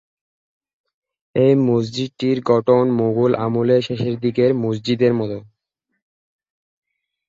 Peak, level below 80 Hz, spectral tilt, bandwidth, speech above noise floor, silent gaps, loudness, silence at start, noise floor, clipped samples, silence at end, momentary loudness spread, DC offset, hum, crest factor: -2 dBFS; -58 dBFS; -8 dB/octave; 7.6 kHz; 59 dB; none; -18 LUFS; 1.35 s; -76 dBFS; under 0.1%; 1.9 s; 8 LU; under 0.1%; none; 16 dB